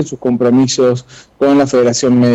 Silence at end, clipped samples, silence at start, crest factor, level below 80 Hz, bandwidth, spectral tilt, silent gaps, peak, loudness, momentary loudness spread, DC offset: 0 s; under 0.1%; 0 s; 8 dB; -50 dBFS; 8.2 kHz; -5.5 dB/octave; none; -4 dBFS; -12 LUFS; 6 LU; under 0.1%